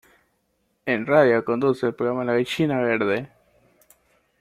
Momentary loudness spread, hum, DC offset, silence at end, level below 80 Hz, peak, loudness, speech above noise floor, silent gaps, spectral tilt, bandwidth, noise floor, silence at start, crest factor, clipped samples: 9 LU; none; under 0.1%; 1.15 s; -64 dBFS; -4 dBFS; -22 LUFS; 49 dB; none; -6.5 dB/octave; 15 kHz; -70 dBFS; 0.85 s; 20 dB; under 0.1%